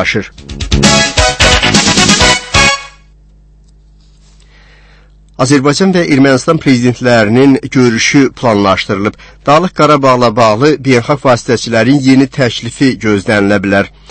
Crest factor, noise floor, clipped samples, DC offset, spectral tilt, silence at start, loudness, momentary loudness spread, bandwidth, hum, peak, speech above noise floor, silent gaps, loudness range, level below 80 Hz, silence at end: 10 dB; -41 dBFS; 1%; under 0.1%; -4 dB/octave; 0 s; -9 LUFS; 7 LU; 11 kHz; 50 Hz at -40 dBFS; 0 dBFS; 32 dB; none; 5 LU; -26 dBFS; 0.2 s